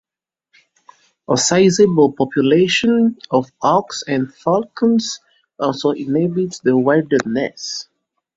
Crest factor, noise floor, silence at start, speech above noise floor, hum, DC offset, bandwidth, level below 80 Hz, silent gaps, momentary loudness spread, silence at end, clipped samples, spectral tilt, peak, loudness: 16 dB; -87 dBFS; 1.3 s; 71 dB; none; under 0.1%; 8 kHz; -58 dBFS; none; 10 LU; 0.55 s; under 0.1%; -4.5 dB/octave; 0 dBFS; -17 LUFS